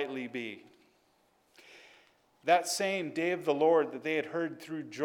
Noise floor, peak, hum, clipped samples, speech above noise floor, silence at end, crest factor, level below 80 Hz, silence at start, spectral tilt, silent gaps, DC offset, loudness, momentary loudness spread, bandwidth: -70 dBFS; -10 dBFS; none; under 0.1%; 39 dB; 0 s; 22 dB; -88 dBFS; 0 s; -3.5 dB/octave; none; under 0.1%; -31 LUFS; 14 LU; 18 kHz